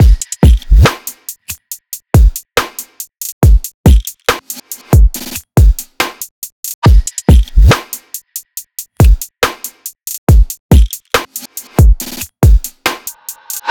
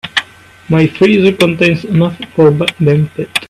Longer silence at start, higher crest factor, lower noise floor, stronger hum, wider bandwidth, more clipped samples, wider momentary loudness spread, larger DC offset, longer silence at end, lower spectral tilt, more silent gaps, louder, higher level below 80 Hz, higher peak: about the same, 0 s vs 0.05 s; about the same, 10 dB vs 12 dB; second, -29 dBFS vs -35 dBFS; neither; first, 19.5 kHz vs 14 kHz; neither; first, 15 LU vs 7 LU; neither; about the same, 0 s vs 0.05 s; second, -5 dB/octave vs -6.5 dB/octave; first, 3.32-3.41 s, 3.74-3.84 s, 6.31-6.42 s, 6.52-6.63 s, 6.74-6.82 s, 10.18-10.27 s, 10.60-10.69 s vs none; about the same, -12 LUFS vs -11 LUFS; first, -12 dBFS vs -46 dBFS; about the same, 0 dBFS vs 0 dBFS